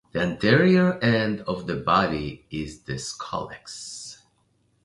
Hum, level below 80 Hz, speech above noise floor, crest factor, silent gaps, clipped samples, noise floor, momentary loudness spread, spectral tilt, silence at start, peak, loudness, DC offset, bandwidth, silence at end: none; -50 dBFS; 43 dB; 20 dB; none; under 0.1%; -67 dBFS; 17 LU; -5.5 dB/octave; 0.15 s; -4 dBFS; -23 LUFS; under 0.1%; 11.5 kHz; 0.7 s